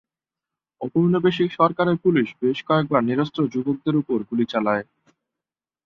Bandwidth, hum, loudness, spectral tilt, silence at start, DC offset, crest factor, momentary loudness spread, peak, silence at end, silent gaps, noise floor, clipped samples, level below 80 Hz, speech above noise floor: 6.8 kHz; none; -21 LUFS; -8.5 dB/octave; 0.8 s; under 0.1%; 20 dB; 6 LU; -4 dBFS; 1.05 s; none; -89 dBFS; under 0.1%; -64 dBFS; 68 dB